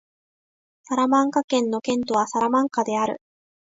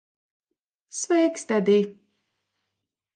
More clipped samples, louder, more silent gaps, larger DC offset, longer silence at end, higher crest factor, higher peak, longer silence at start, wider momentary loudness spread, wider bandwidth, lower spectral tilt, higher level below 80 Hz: neither; about the same, -22 LUFS vs -23 LUFS; first, 1.44-1.48 s vs none; neither; second, 0.5 s vs 1.25 s; about the same, 16 dB vs 18 dB; about the same, -8 dBFS vs -8 dBFS; about the same, 0.9 s vs 0.95 s; second, 7 LU vs 12 LU; second, 7.8 kHz vs 10 kHz; about the same, -4 dB/octave vs -5 dB/octave; first, -68 dBFS vs -78 dBFS